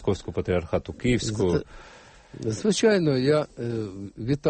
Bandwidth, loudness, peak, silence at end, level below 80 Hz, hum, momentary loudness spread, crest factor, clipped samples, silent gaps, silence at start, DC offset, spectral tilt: 8.8 kHz; -25 LUFS; -8 dBFS; 0 s; -46 dBFS; none; 12 LU; 16 dB; under 0.1%; none; 0 s; under 0.1%; -5.5 dB/octave